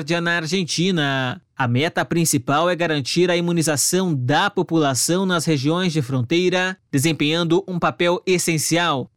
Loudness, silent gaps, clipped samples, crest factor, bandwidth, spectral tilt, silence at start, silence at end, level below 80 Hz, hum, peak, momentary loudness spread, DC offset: -19 LUFS; none; under 0.1%; 14 dB; 17 kHz; -4 dB/octave; 0 s; 0.1 s; -60 dBFS; none; -6 dBFS; 3 LU; 0.2%